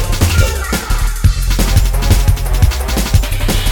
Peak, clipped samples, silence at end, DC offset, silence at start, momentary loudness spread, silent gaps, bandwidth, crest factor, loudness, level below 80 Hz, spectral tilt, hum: 0 dBFS; under 0.1%; 0 s; under 0.1%; 0 s; 4 LU; none; 17.5 kHz; 12 dB; -15 LUFS; -14 dBFS; -4.5 dB/octave; none